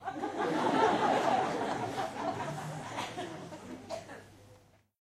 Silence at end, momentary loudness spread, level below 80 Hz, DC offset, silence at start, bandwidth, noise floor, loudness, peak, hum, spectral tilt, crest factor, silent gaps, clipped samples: 0.45 s; 17 LU; -68 dBFS; under 0.1%; 0 s; 15 kHz; -61 dBFS; -33 LUFS; -12 dBFS; none; -5 dB/octave; 22 dB; none; under 0.1%